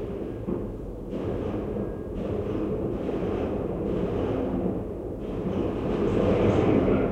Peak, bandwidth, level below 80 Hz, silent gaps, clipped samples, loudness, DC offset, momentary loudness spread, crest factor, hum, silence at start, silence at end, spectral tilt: -10 dBFS; 9.6 kHz; -40 dBFS; none; under 0.1%; -28 LUFS; under 0.1%; 11 LU; 16 dB; none; 0 s; 0 s; -9 dB/octave